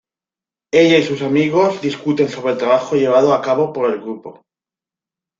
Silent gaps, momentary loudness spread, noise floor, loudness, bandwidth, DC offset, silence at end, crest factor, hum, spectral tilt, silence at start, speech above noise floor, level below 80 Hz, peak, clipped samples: none; 8 LU; -90 dBFS; -16 LUFS; 7.6 kHz; under 0.1%; 1.1 s; 16 dB; none; -6 dB/octave; 0.75 s; 74 dB; -62 dBFS; -2 dBFS; under 0.1%